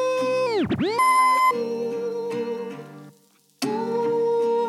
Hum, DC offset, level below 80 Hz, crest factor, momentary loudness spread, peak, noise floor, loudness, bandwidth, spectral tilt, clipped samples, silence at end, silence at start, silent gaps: none; under 0.1%; -60 dBFS; 12 dB; 13 LU; -10 dBFS; -59 dBFS; -23 LUFS; 15 kHz; -4.5 dB/octave; under 0.1%; 0 s; 0 s; none